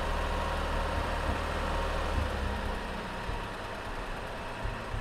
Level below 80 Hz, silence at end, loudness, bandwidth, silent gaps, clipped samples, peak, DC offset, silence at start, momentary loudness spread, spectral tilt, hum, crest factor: -36 dBFS; 0 s; -34 LUFS; 15 kHz; none; under 0.1%; -18 dBFS; under 0.1%; 0 s; 6 LU; -5.5 dB/octave; none; 14 dB